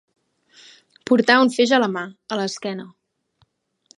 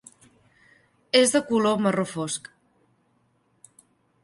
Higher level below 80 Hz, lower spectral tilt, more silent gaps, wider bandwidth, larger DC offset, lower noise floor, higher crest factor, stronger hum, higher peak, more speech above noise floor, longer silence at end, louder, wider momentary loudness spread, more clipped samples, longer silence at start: about the same, -74 dBFS vs -70 dBFS; about the same, -4 dB/octave vs -3.5 dB/octave; neither; about the same, 11 kHz vs 12 kHz; neither; about the same, -65 dBFS vs -67 dBFS; about the same, 22 dB vs 22 dB; neither; first, 0 dBFS vs -6 dBFS; about the same, 46 dB vs 45 dB; second, 1.1 s vs 1.85 s; first, -19 LUFS vs -23 LUFS; first, 15 LU vs 11 LU; neither; about the same, 1.05 s vs 1.15 s